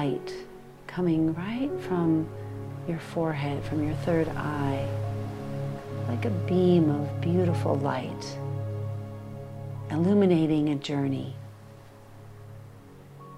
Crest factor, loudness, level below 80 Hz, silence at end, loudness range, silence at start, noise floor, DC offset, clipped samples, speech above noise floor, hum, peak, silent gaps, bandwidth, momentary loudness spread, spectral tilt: 18 dB; -28 LUFS; -54 dBFS; 0 s; 3 LU; 0 s; -48 dBFS; under 0.1%; under 0.1%; 22 dB; none; -10 dBFS; none; 14 kHz; 20 LU; -8 dB/octave